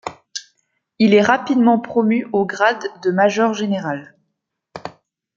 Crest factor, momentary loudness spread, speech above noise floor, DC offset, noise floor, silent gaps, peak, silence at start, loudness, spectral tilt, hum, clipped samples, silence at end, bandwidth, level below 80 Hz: 16 dB; 18 LU; 59 dB; under 0.1%; -75 dBFS; none; -2 dBFS; 0.05 s; -17 LUFS; -5.5 dB/octave; none; under 0.1%; 0.45 s; 7.6 kHz; -64 dBFS